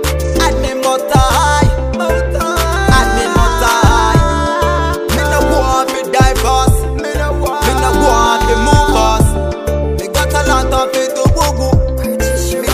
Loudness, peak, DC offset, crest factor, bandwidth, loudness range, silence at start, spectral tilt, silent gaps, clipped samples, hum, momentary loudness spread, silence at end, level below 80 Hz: -12 LUFS; 0 dBFS; under 0.1%; 12 dB; 16 kHz; 1 LU; 0 s; -5 dB/octave; none; under 0.1%; none; 6 LU; 0 s; -18 dBFS